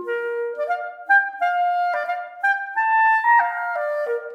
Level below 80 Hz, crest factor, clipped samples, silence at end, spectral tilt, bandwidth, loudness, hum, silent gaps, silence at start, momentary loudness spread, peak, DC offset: -82 dBFS; 14 dB; under 0.1%; 0 s; -1 dB/octave; 9.2 kHz; -20 LUFS; none; none; 0 s; 10 LU; -6 dBFS; under 0.1%